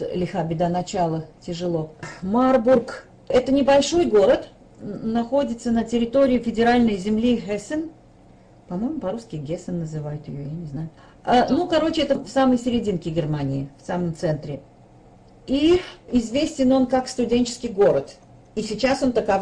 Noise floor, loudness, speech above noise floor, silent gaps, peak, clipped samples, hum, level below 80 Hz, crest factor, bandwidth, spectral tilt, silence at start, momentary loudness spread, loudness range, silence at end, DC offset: -50 dBFS; -22 LUFS; 29 dB; none; -8 dBFS; under 0.1%; none; -46 dBFS; 12 dB; 10 kHz; -6 dB/octave; 0 s; 15 LU; 7 LU; 0 s; under 0.1%